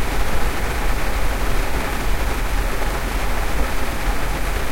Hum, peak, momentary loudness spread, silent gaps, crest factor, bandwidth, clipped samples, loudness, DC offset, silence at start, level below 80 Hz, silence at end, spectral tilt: none; -4 dBFS; 1 LU; none; 12 dB; 16.5 kHz; under 0.1%; -24 LUFS; under 0.1%; 0 s; -22 dBFS; 0 s; -4.5 dB/octave